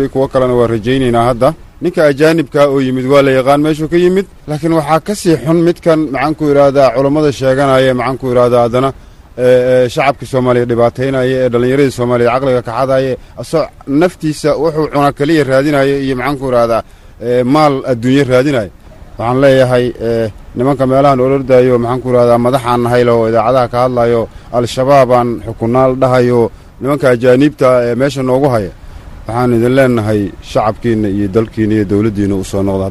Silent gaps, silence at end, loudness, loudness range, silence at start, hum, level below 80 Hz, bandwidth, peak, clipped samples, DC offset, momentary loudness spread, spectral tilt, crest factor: none; 0 s; -11 LUFS; 2 LU; 0 s; none; -36 dBFS; 12.5 kHz; 0 dBFS; under 0.1%; under 0.1%; 7 LU; -7 dB/octave; 10 dB